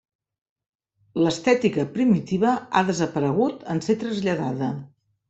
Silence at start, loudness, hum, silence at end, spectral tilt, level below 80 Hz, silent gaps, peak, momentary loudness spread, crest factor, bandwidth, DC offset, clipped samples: 1.15 s; -23 LUFS; none; 0.45 s; -6 dB/octave; -62 dBFS; none; -4 dBFS; 8 LU; 18 dB; 8.2 kHz; under 0.1%; under 0.1%